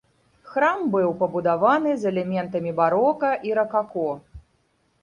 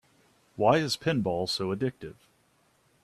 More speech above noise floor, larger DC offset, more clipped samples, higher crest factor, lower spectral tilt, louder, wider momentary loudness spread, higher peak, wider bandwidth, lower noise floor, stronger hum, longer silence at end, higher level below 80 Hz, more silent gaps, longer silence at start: first, 45 dB vs 39 dB; neither; neither; about the same, 18 dB vs 22 dB; first, -7.5 dB/octave vs -5 dB/octave; first, -22 LUFS vs -28 LUFS; second, 8 LU vs 21 LU; about the same, -6 dBFS vs -8 dBFS; second, 10.5 kHz vs 14 kHz; about the same, -66 dBFS vs -67 dBFS; neither; second, 0.6 s vs 0.9 s; first, -58 dBFS vs -64 dBFS; neither; second, 0.45 s vs 0.6 s